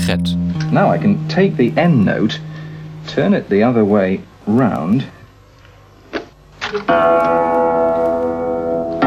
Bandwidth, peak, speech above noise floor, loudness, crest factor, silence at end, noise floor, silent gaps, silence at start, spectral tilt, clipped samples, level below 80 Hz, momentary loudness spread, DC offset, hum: 14 kHz; 0 dBFS; 29 dB; -15 LUFS; 16 dB; 0 s; -44 dBFS; none; 0 s; -7.5 dB/octave; under 0.1%; -48 dBFS; 15 LU; under 0.1%; 50 Hz at -45 dBFS